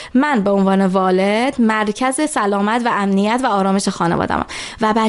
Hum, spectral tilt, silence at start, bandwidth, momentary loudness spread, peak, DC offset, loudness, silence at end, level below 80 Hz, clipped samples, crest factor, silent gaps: none; -5.5 dB/octave; 0 s; 11.5 kHz; 3 LU; -2 dBFS; under 0.1%; -16 LUFS; 0 s; -46 dBFS; under 0.1%; 14 dB; none